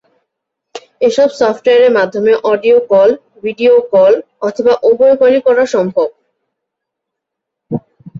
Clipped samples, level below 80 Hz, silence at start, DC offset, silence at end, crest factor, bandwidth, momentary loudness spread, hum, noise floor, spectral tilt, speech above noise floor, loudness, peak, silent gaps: under 0.1%; -58 dBFS; 0.75 s; under 0.1%; 0 s; 12 dB; 7.6 kHz; 11 LU; none; -78 dBFS; -5.5 dB/octave; 68 dB; -11 LUFS; 0 dBFS; none